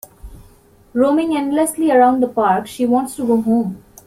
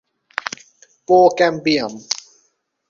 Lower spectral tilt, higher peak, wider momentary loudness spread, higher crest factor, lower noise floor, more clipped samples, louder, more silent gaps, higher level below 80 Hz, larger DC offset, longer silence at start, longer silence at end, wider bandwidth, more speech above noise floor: first, -5.5 dB/octave vs -3.5 dB/octave; about the same, -2 dBFS vs 0 dBFS; second, 6 LU vs 17 LU; about the same, 16 dB vs 18 dB; second, -48 dBFS vs -65 dBFS; neither; about the same, -16 LUFS vs -17 LUFS; neither; first, -48 dBFS vs -62 dBFS; neither; second, 0.25 s vs 0.45 s; second, 0.3 s vs 0.75 s; first, 16 kHz vs 7.6 kHz; second, 33 dB vs 50 dB